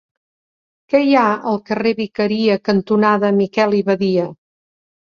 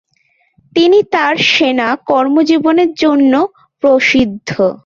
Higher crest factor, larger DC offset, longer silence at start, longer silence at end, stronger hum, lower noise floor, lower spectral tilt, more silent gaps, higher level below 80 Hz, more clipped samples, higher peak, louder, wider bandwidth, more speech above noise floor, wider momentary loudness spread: about the same, 16 dB vs 12 dB; neither; first, 0.9 s vs 0.75 s; first, 0.8 s vs 0.1 s; neither; first, under -90 dBFS vs -58 dBFS; first, -7.5 dB/octave vs -4.5 dB/octave; neither; second, -60 dBFS vs -48 dBFS; neither; about the same, -2 dBFS vs 0 dBFS; second, -16 LUFS vs -12 LUFS; about the same, 6.8 kHz vs 7.4 kHz; first, over 74 dB vs 47 dB; about the same, 6 LU vs 6 LU